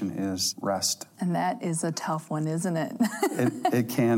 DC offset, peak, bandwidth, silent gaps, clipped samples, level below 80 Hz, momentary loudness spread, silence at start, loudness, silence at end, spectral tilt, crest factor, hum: under 0.1%; -12 dBFS; 16.5 kHz; none; under 0.1%; -76 dBFS; 4 LU; 0 s; -28 LUFS; 0 s; -4.5 dB/octave; 16 dB; none